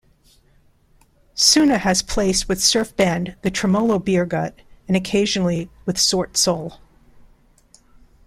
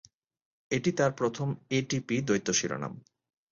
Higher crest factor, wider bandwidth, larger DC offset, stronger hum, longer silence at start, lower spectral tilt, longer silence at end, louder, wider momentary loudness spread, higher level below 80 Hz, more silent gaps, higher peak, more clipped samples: about the same, 18 dB vs 18 dB; first, 15.5 kHz vs 7.8 kHz; neither; neither; first, 1.35 s vs 0.7 s; about the same, -3.5 dB/octave vs -4.5 dB/octave; first, 1.5 s vs 0.5 s; first, -18 LUFS vs -30 LUFS; about the same, 11 LU vs 9 LU; first, -42 dBFS vs -66 dBFS; neither; first, -2 dBFS vs -14 dBFS; neither